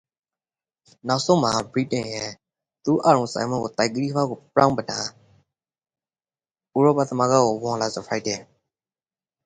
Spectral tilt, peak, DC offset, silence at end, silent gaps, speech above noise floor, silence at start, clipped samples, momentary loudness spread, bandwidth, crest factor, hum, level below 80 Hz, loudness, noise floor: -5 dB/octave; -2 dBFS; under 0.1%; 1 s; none; over 68 dB; 1.05 s; under 0.1%; 11 LU; 10.5 kHz; 22 dB; none; -62 dBFS; -22 LUFS; under -90 dBFS